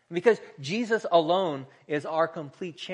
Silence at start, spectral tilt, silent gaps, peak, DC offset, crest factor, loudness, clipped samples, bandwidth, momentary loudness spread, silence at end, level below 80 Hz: 0.1 s; -5.5 dB/octave; none; -6 dBFS; under 0.1%; 20 dB; -27 LUFS; under 0.1%; 10 kHz; 14 LU; 0 s; -82 dBFS